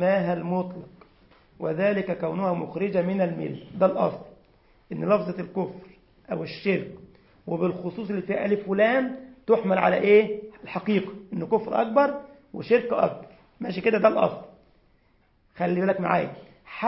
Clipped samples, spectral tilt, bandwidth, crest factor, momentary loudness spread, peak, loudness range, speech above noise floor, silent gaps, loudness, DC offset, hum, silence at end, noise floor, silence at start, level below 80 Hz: under 0.1%; -11 dB/octave; 5.8 kHz; 20 dB; 15 LU; -6 dBFS; 6 LU; 39 dB; none; -25 LUFS; under 0.1%; none; 0 s; -63 dBFS; 0 s; -64 dBFS